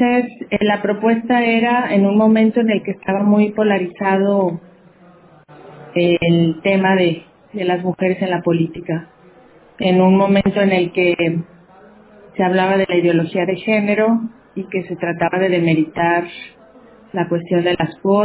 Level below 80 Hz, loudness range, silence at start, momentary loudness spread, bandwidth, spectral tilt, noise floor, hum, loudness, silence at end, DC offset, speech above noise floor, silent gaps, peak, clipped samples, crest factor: -52 dBFS; 4 LU; 0 s; 11 LU; 4 kHz; -11 dB/octave; -46 dBFS; none; -16 LUFS; 0 s; under 0.1%; 31 dB; none; -4 dBFS; under 0.1%; 14 dB